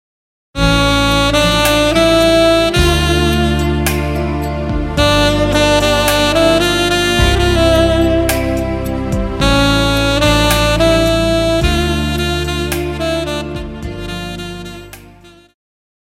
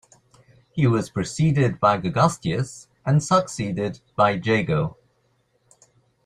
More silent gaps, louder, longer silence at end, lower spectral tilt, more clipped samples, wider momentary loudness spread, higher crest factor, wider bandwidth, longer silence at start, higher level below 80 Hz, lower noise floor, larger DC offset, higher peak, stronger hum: neither; first, -13 LUFS vs -22 LUFS; second, 0.95 s vs 1.35 s; second, -4.5 dB/octave vs -6.5 dB/octave; neither; about the same, 12 LU vs 10 LU; second, 14 dB vs 20 dB; first, 17 kHz vs 11.5 kHz; second, 0.55 s vs 0.75 s; first, -22 dBFS vs -54 dBFS; second, -41 dBFS vs -66 dBFS; neither; first, 0 dBFS vs -4 dBFS; neither